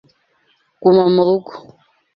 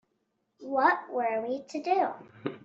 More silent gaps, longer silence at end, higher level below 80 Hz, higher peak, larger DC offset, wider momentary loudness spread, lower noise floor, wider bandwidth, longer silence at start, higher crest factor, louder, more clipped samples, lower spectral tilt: neither; first, 0.55 s vs 0.05 s; first, -62 dBFS vs -80 dBFS; first, -2 dBFS vs -10 dBFS; neither; second, 10 LU vs 14 LU; second, -61 dBFS vs -77 dBFS; second, 5.4 kHz vs 7.8 kHz; first, 0.8 s vs 0.6 s; about the same, 16 dB vs 20 dB; first, -14 LUFS vs -29 LUFS; neither; first, -10 dB/octave vs -3 dB/octave